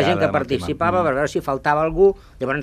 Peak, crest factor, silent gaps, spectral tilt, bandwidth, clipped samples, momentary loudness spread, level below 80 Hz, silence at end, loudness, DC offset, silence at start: -4 dBFS; 16 dB; none; -6 dB/octave; 14 kHz; under 0.1%; 7 LU; -42 dBFS; 0 s; -20 LUFS; under 0.1%; 0 s